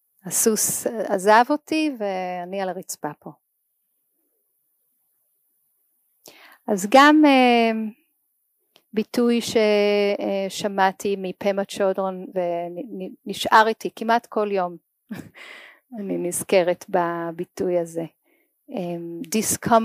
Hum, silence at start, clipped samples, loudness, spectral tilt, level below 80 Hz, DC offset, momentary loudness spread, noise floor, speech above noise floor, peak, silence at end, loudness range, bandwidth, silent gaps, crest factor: none; 0.25 s; under 0.1%; -21 LUFS; -3.5 dB/octave; -68 dBFS; under 0.1%; 17 LU; -73 dBFS; 51 dB; -4 dBFS; 0 s; 10 LU; 15.5 kHz; none; 20 dB